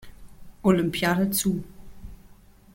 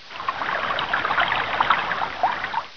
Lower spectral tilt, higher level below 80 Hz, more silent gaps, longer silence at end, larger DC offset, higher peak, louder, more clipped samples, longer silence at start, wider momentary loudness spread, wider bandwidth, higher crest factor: first, -5 dB/octave vs -3.5 dB/octave; first, -48 dBFS vs -54 dBFS; neither; first, 0.4 s vs 0 s; second, under 0.1% vs 0.7%; about the same, -6 dBFS vs -4 dBFS; about the same, -24 LUFS vs -23 LUFS; neither; about the same, 0 s vs 0 s; about the same, 5 LU vs 6 LU; first, 17 kHz vs 5.4 kHz; about the same, 20 dB vs 20 dB